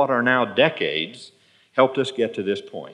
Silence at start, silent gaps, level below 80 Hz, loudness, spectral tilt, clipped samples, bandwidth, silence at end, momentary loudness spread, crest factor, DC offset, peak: 0 s; none; -84 dBFS; -22 LUFS; -5.5 dB/octave; under 0.1%; 10.5 kHz; 0 s; 10 LU; 20 dB; under 0.1%; -4 dBFS